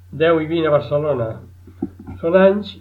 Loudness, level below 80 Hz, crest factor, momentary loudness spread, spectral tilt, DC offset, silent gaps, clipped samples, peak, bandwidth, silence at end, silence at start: -17 LUFS; -52 dBFS; 16 dB; 17 LU; -9 dB/octave; under 0.1%; none; under 0.1%; -2 dBFS; 5.2 kHz; 0 s; 0.1 s